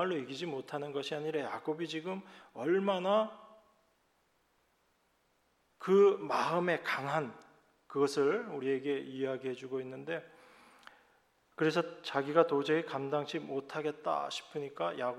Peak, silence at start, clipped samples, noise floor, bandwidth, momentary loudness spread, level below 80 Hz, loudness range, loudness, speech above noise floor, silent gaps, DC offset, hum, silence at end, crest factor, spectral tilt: -12 dBFS; 0 s; under 0.1%; -74 dBFS; 12.5 kHz; 11 LU; -86 dBFS; 6 LU; -34 LUFS; 41 dB; none; under 0.1%; none; 0 s; 24 dB; -5.5 dB/octave